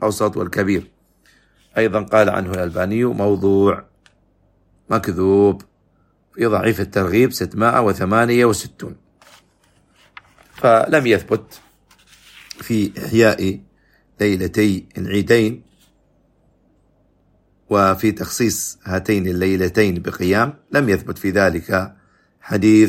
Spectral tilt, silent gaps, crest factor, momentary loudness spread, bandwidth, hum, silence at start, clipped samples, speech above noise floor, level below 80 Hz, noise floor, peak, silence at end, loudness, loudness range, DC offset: -5.5 dB/octave; none; 18 dB; 9 LU; 16 kHz; none; 0 s; under 0.1%; 43 dB; -48 dBFS; -60 dBFS; 0 dBFS; 0 s; -18 LUFS; 4 LU; under 0.1%